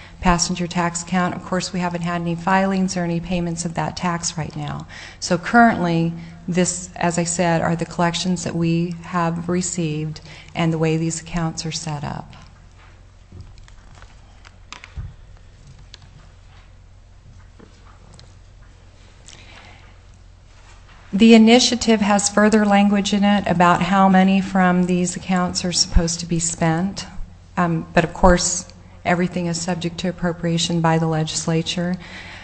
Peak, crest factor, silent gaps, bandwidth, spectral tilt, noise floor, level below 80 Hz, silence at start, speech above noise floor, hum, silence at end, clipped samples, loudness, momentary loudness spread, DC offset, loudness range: 0 dBFS; 20 dB; none; 8.6 kHz; -4.5 dB/octave; -45 dBFS; -36 dBFS; 0 s; 27 dB; none; 0 s; under 0.1%; -19 LUFS; 14 LU; under 0.1%; 9 LU